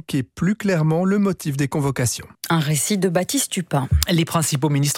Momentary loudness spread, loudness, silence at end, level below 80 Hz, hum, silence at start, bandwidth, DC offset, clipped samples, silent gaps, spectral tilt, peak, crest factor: 4 LU; -20 LUFS; 0 s; -36 dBFS; none; 0.1 s; 17 kHz; under 0.1%; under 0.1%; none; -5 dB/octave; 0 dBFS; 20 dB